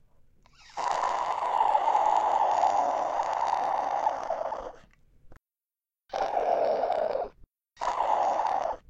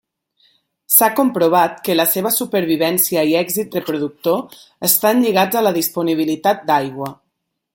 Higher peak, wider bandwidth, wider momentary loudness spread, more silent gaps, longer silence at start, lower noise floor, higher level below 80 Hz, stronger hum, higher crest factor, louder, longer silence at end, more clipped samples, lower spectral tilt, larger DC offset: second, -12 dBFS vs 0 dBFS; second, 8.8 kHz vs 17 kHz; about the same, 10 LU vs 9 LU; neither; second, 0.7 s vs 0.9 s; first, under -90 dBFS vs -74 dBFS; about the same, -60 dBFS vs -62 dBFS; neither; about the same, 16 dB vs 18 dB; second, -28 LUFS vs -16 LUFS; second, 0.1 s vs 0.6 s; neither; about the same, -3 dB/octave vs -3.5 dB/octave; neither